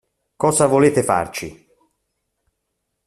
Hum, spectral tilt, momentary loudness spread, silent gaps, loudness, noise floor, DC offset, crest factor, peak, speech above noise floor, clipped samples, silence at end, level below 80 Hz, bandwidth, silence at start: none; -5 dB/octave; 15 LU; none; -17 LUFS; -76 dBFS; under 0.1%; 18 dB; -2 dBFS; 59 dB; under 0.1%; 1.55 s; -54 dBFS; 14 kHz; 0.4 s